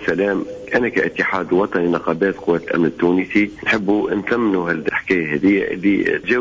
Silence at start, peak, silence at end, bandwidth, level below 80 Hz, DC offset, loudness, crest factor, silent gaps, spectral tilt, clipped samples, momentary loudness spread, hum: 0 s; -6 dBFS; 0 s; 7.6 kHz; -50 dBFS; under 0.1%; -18 LUFS; 12 dB; none; -7 dB/octave; under 0.1%; 3 LU; none